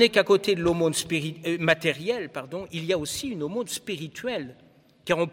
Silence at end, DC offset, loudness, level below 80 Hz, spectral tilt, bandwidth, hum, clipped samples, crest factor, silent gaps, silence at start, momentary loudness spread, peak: 0 s; under 0.1%; -26 LUFS; -58 dBFS; -4 dB/octave; 17 kHz; none; under 0.1%; 20 dB; none; 0 s; 12 LU; -6 dBFS